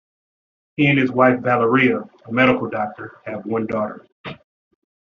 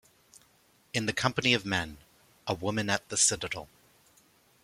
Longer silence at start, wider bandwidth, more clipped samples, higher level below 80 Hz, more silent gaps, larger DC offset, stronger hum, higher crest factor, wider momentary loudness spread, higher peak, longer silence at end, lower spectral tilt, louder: second, 0.8 s vs 0.95 s; second, 6.4 kHz vs 16.5 kHz; neither; about the same, -60 dBFS vs -62 dBFS; first, 4.12-4.24 s vs none; neither; neither; second, 18 dB vs 24 dB; first, 19 LU vs 13 LU; first, -2 dBFS vs -8 dBFS; second, 0.75 s vs 1 s; first, -4.5 dB/octave vs -2.5 dB/octave; first, -18 LUFS vs -29 LUFS